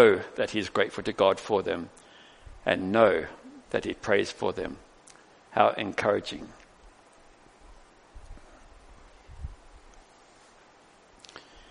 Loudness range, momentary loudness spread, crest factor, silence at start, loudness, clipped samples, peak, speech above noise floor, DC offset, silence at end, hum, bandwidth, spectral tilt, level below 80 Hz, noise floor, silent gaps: 7 LU; 24 LU; 26 dB; 0 s; -27 LUFS; under 0.1%; -4 dBFS; 31 dB; under 0.1%; 0.3 s; none; 10.5 kHz; -5 dB/octave; -54 dBFS; -57 dBFS; none